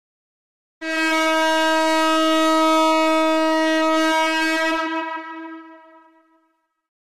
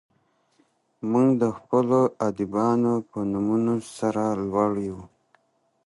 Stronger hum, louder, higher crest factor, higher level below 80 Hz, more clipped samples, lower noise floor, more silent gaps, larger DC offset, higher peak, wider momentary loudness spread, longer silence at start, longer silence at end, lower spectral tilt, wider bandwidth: neither; first, -18 LUFS vs -24 LUFS; second, 8 dB vs 18 dB; about the same, -62 dBFS vs -60 dBFS; neither; about the same, -68 dBFS vs -67 dBFS; neither; neither; second, -12 dBFS vs -8 dBFS; first, 13 LU vs 7 LU; second, 0.8 s vs 1.05 s; second, 0.1 s vs 0.8 s; second, -1 dB/octave vs -8 dB/octave; first, 15.5 kHz vs 11.5 kHz